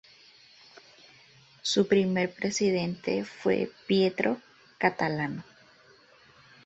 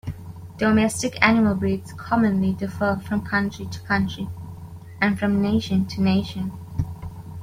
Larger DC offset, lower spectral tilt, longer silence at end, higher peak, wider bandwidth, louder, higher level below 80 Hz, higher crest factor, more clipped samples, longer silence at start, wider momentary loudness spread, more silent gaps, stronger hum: neither; about the same, -5 dB/octave vs -6 dB/octave; first, 1.25 s vs 0 s; second, -8 dBFS vs -2 dBFS; second, 8.2 kHz vs 15 kHz; second, -28 LUFS vs -22 LUFS; second, -68 dBFS vs -46 dBFS; about the same, 22 dB vs 20 dB; neither; first, 1.65 s vs 0.05 s; second, 8 LU vs 17 LU; neither; neither